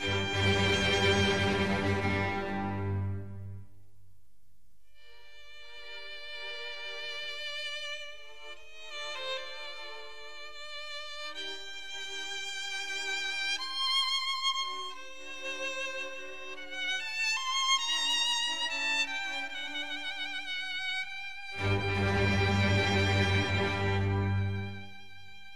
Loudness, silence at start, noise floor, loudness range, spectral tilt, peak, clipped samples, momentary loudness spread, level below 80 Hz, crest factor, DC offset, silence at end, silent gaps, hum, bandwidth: -31 LUFS; 0 s; -69 dBFS; 12 LU; -4 dB/octave; -14 dBFS; under 0.1%; 17 LU; -54 dBFS; 18 dB; 0.6%; 0 s; none; none; 13 kHz